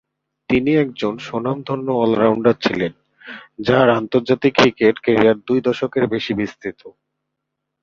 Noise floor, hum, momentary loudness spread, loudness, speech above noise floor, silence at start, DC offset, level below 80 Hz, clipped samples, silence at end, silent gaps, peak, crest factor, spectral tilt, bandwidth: -78 dBFS; none; 11 LU; -18 LUFS; 61 dB; 0.5 s; under 0.1%; -52 dBFS; under 0.1%; 0.95 s; none; 0 dBFS; 18 dB; -6.5 dB/octave; 7.4 kHz